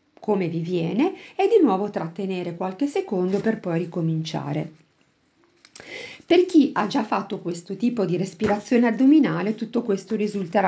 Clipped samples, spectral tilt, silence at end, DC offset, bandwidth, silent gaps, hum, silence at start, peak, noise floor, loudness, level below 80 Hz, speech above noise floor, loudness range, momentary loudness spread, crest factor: under 0.1%; -7 dB/octave; 0 s; under 0.1%; 8 kHz; none; none; 0.2 s; -6 dBFS; -64 dBFS; -23 LUFS; -64 dBFS; 42 dB; 5 LU; 12 LU; 16 dB